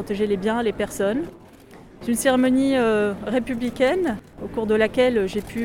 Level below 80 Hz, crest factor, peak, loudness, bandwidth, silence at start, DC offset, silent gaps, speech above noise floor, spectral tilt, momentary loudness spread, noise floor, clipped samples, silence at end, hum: -48 dBFS; 16 dB; -4 dBFS; -22 LUFS; 17 kHz; 0 s; under 0.1%; none; 24 dB; -5 dB/octave; 10 LU; -45 dBFS; under 0.1%; 0 s; none